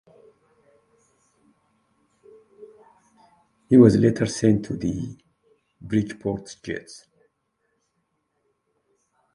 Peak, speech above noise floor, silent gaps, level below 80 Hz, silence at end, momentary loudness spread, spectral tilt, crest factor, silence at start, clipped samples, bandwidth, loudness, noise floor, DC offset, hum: -2 dBFS; 54 dB; none; -54 dBFS; 2.4 s; 19 LU; -7 dB/octave; 24 dB; 2.6 s; under 0.1%; 11 kHz; -21 LUFS; -74 dBFS; under 0.1%; none